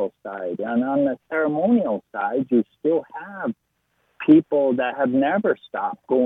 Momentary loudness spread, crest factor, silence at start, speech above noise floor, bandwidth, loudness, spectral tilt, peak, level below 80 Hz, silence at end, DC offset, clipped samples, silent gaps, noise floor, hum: 13 LU; 18 dB; 0 s; 49 dB; 3.9 kHz; -22 LUFS; -9.5 dB/octave; -4 dBFS; -68 dBFS; 0 s; under 0.1%; under 0.1%; none; -70 dBFS; none